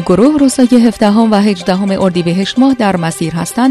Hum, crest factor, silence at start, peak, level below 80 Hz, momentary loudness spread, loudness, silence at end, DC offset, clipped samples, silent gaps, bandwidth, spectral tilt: none; 10 dB; 0 s; 0 dBFS; -42 dBFS; 6 LU; -11 LUFS; 0 s; under 0.1%; 0.4%; none; 13 kHz; -6 dB/octave